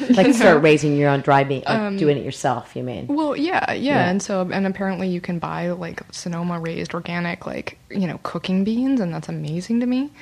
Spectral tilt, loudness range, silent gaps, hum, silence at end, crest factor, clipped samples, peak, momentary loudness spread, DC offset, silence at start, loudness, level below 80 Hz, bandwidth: -6 dB/octave; 8 LU; none; none; 0.15 s; 16 dB; under 0.1%; -4 dBFS; 13 LU; under 0.1%; 0 s; -21 LUFS; -54 dBFS; 13 kHz